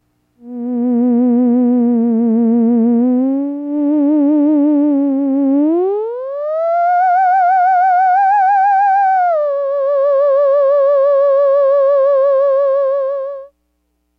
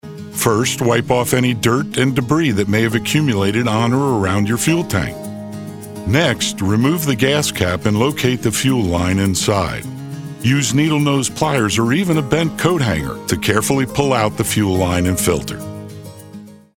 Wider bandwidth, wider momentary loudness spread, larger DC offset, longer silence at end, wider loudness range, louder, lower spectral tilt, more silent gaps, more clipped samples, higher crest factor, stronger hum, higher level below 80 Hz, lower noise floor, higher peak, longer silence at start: second, 4.9 kHz vs 18 kHz; second, 7 LU vs 13 LU; neither; first, 0.75 s vs 0.25 s; about the same, 2 LU vs 2 LU; first, -13 LUFS vs -16 LUFS; first, -9 dB/octave vs -5 dB/octave; neither; neither; second, 6 dB vs 16 dB; neither; second, -68 dBFS vs -42 dBFS; first, -65 dBFS vs -37 dBFS; second, -6 dBFS vs -2 dBFS; first, 0.45 s vs 0.05 s